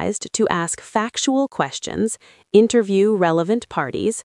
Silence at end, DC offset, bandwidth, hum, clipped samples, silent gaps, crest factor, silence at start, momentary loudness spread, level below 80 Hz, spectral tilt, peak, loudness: 0.05 s; under 0.1%; 12 kHz; none; under 0.1%; none; 20 dB; 0 s; 8 LU; -58 dBFS; -4.5 dB/octave; 0 dBFS; -19 LUFS